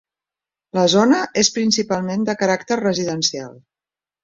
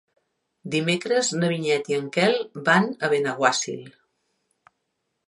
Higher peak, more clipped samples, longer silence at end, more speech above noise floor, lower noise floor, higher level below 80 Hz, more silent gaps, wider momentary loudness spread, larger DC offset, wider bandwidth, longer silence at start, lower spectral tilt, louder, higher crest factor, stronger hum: about the same, -2 dBFS vs -4 dBFS; neither; second, 0.7 s vs 1.35 s; first, over 72 dB vs 54 dB; first, under -90 dBFS vs -77 dBFS; first, -60 dBFS vs -74 dBFS; neither; about the same, 7 LU vs 7 LU; neither; second, 7.8 kHz vs 11.5 kHz; about the same, 0.75 s vs 0.65 s; about the same, -3.5 dB/octave vs -4 dB/octave; first, -18 LUFS vs -23 LUFS; about the same, 18 dB vs 22 dB; neither